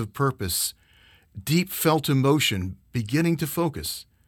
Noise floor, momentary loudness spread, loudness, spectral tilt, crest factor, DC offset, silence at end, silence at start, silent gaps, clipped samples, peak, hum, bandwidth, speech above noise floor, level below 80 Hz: -57 dBFS; 10 LU; -24 LUFS; -4.5 dB/octave; 16 dB; under 0.1%; 0.25 s; 0 s; none; under 0.1%; -8 dBFS; none; 20 kHz; 32 dB; -52 dBFS